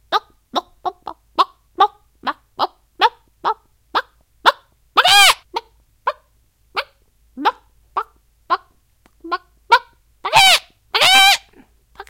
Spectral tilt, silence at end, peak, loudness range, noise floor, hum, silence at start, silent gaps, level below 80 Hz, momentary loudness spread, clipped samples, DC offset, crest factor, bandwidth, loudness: 0.5 dB/octave; 0.05 s; 0 dBFS; 12 LU; -58 dBFS; none; 0.1 s; none; -56 dBFS; 18 LU; under 0.1%; under 0.1%; 20 dB; over 20 kHz; -16 LUFS